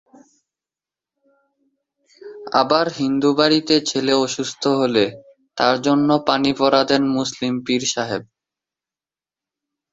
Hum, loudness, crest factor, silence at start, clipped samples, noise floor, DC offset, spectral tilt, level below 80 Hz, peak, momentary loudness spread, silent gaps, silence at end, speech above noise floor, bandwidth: none; -18 LUFS; 20 dB; 2.25 s; under 0.1%; under -90 dBFS; under 0.1%; -4 dB/octave; -62 dBFS; 0 dBFS; 8 LU; none; 1.7 s; over 72 dB; 8 kHz